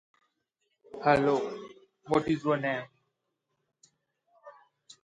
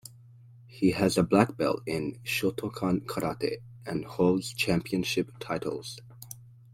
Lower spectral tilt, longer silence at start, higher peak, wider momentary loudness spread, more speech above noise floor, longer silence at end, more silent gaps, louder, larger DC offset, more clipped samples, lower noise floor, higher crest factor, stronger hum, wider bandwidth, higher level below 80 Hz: about the same, -6.5 dB/octave vs -5.5 dB/octave; first, 0.95 s vs 0.05 s; second, -10 dBFS vs -6 dBFS; first, 23 LU vs 18 LU; first, 55 dB vs 24 dB; first, 0.55 s vs 0.25 s; neither; about the same, -29 LUFS vs -29 LUFS; neither; neither; first, -82 dBFS vs -52 dBFS; about the same, 22 dB vs 24 dB; neither; second, 11 kHz vs 16.5 kHz; second, -66 dBFS vs -56 dBFS